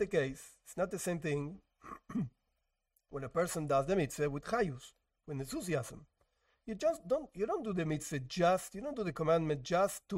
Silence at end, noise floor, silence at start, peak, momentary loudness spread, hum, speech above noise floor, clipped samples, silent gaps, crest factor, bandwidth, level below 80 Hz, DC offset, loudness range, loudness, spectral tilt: 0 s; -83 dBFS; 0 s; -18 dBFS; 15 LU; none; 48 dB; under 0.1%; none; 18 dB; 16 kHz; -62 dBFS; under 0.1%; 5 LU; -36 LUFS; -5.5 dB/octave